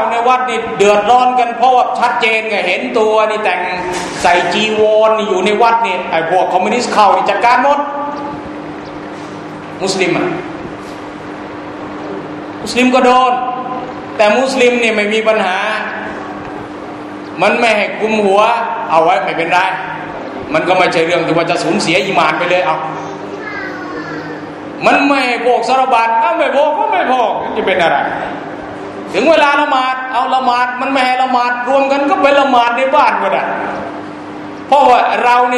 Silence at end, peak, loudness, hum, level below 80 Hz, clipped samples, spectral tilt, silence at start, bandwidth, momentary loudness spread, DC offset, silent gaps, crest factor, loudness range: 0 s; 0 dBFS; -12 LUFS; none; -52 dBFS; under 0.1%; -4 dB/octave; 0 s; 12 kHz; 16 LU; under 0.1%; none; 12 dB; 4 LU